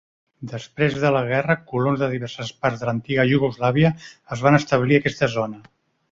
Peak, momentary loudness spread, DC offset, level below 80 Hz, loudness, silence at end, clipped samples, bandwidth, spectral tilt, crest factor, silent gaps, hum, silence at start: -2 dBFS; 14 LU; under 0.1%; -52 dBFS; -21 LUFS; 0.5 s; under 0.1%; 7.6 kHz; -7 dB/octave; 18 dB; none; none; 0.4 s